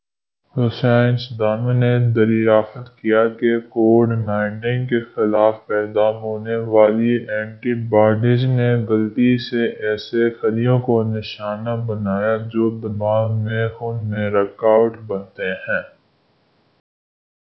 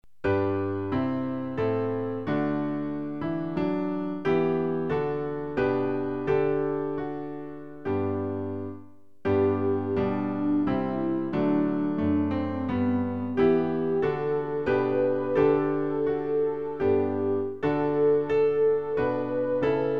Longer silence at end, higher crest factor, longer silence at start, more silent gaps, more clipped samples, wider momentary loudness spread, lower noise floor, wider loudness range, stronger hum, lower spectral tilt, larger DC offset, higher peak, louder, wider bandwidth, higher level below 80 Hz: first, 1.55 s vs 0 s; about the same, 18 dB vs 16 dB; first, 0.55 s vs 0.25 s; neither; neither; about the same, 9 LU vs 8 LU; first, -73 dBFS vs -50 dBFS; about the same, 4 LU vs 4 LU; neither; about the same, -10 dB/octave vs -9.5 dB/octave; second, under 0.1% vs 0.5%; first, 0 dBFS vs -10 dBFS; first, -18 LUFS vs -27 LUFS; about the same, 6 kHz vs 5.8 kHz; about the same, -54 dBFS vs -56 dBFS